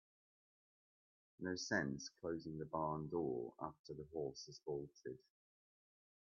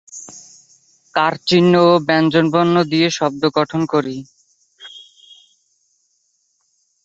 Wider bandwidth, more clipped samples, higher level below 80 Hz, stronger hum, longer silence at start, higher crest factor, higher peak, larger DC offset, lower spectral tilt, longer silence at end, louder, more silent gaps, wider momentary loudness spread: second, 7.2 kHz vs 8 kHz; neither; second, -76 dBFS vs -60 dBFS; neither; first, 1.4 s vs 0.15 s; about the same, 22 dB vs 18 dB; second, -26 dBFS vs 0 dBFS; neither; about the same, -4.5 dB/octave vs -5.5 dB/octave; second, 1.1 s vs 2.05 s; second, -46 LUFS vs -15 LUFS; first, 3.79-3.84 s vs none; second, 12 LU vs 22 LU